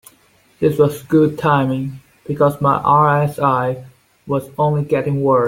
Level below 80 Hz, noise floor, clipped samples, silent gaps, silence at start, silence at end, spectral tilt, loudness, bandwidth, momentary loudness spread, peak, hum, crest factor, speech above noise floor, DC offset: -52 dBFS; -54 dBFS; under 0.1%; none; 0.6 s; 0 s; -8 dB/octave; -16 LUFS; 16.5 kHz; 11 LU; -2 dBFS; none; 16 dB; 38 dB; under 0.1%